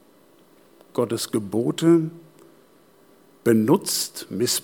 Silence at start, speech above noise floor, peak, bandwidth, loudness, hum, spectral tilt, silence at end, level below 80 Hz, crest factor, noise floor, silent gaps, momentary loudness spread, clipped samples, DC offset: 0.95 s; 34 dB; -6 dBFS; 18.5 kHz; -22 LUFS; none; -4.5 dB/octave; 0.05 s; -74 dBFS; 18 dB; -55 dBFS; none; 9 LU; under 0.1%; under 0.1%